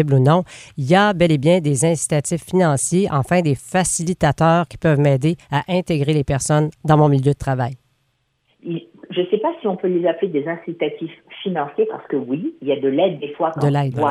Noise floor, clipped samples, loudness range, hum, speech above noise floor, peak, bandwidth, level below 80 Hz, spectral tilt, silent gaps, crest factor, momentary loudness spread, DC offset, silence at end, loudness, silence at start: -67 dBFS; under 0.1%; 6 LU; none; 49 dB; -2 dBFS; 13.5 kHz; -48 dBFS; -6 dB/octave; none; 16 dB; 10 LU; under 0.1%; 0 s; -18 LUFS; 0 s